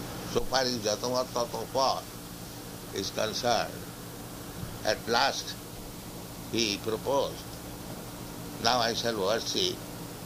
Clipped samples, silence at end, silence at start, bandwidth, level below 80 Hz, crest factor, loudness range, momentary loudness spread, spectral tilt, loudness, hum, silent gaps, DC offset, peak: under 0.1%; 0 s; 0 s; 15.5 kHz; -52 dBFS; 24 dB; 3 LU; 15 LU; -3 dB/octave; -30 LUFS; none; none; under 0.1%; -8 dBFS